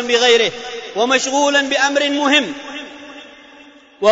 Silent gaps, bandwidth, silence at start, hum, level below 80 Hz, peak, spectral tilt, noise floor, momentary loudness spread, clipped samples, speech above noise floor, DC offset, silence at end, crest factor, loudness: none; 8 kHz; 0 s; none; -60 dBFS; -2 dBFS; -1 dB/octave; -44 dBFS; 18 LU; under 0.1%; 28 dB; under 0.1%; 0 s; 14 dB; -15 LUFS